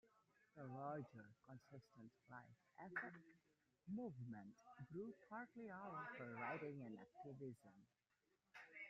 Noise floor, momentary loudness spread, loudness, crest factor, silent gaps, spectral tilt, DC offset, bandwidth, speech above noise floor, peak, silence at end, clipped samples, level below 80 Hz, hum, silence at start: -88 dBFS; 14 LU; -55 LUFS; 22 dB; none; -6.5 dB/octave; under 0.1%; 7.4 kHz; 32 dB; -36 dBFS; 0 s; under 0.1%; -90 dBFS; none; 0.05 s